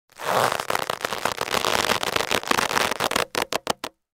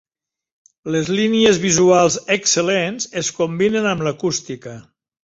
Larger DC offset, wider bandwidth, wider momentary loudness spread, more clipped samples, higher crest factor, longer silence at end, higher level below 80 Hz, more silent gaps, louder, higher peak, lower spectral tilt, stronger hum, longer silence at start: neither; first, 17 kHz vs 8 kHz; second, 5 LU vs 11 LU; neither; first, 24 dB vs 16 dB; about the same, 0.3 s vs 0.4 s; about the same, -54 dBFS vs -56 dBFS; neither; second, -23 LUFS vs -17 LUFS; about the same, -2 dBFS vs -2 dBFS; second, -2 dB/octave vs -3.5 dB/octave; neither; second, 0.15 s vs 0.85 s